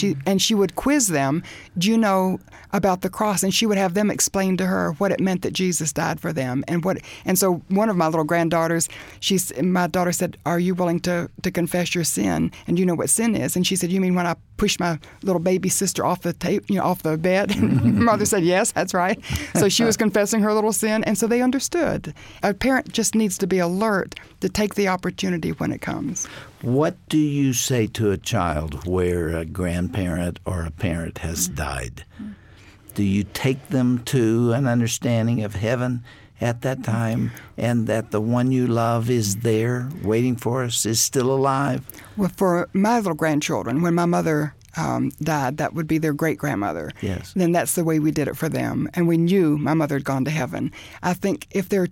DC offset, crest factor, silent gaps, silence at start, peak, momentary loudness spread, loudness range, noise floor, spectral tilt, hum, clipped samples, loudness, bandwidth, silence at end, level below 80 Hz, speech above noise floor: under 0.1%; 16 dB; none; 0 s; -6 dBFS; 8 LU; 4 LU; -47 dBFS; -5 dB/octave; none; under 0.1%; -22 LUFS; 17 kHz; 0 s; -46 dBFS; 26 dB